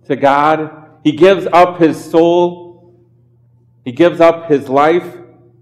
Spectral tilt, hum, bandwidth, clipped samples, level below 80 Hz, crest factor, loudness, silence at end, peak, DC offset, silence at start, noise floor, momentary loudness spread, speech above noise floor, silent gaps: -6.5 dB/octave; none; 12.5 kHz; under 0.1%; -56 dBFS; 12 dB; -12 LUFS; 0.4 s; 0 dBFS; under 0.1%; 0.1 s; -50 dBFS; 9 LU; 39 dB; none